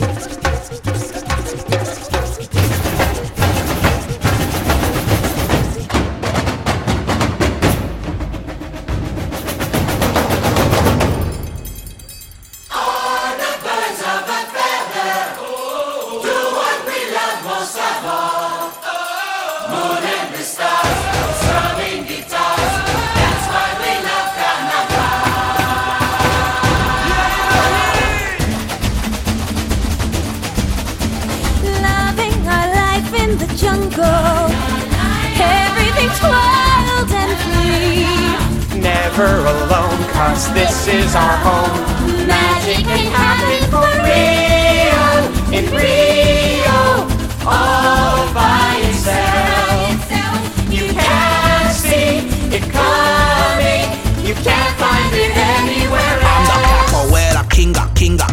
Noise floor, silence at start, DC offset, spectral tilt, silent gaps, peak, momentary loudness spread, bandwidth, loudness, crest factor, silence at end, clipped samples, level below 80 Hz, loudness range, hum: -36 dBFS; 0 s; under 0.1%; -4.5 dB/octave; none; 0 dBFS; 9 LU; 16.5 kHz; -15 LUFS; 14 dB; 0 s; under 0.1%; -24 dBFS; 7 LU; none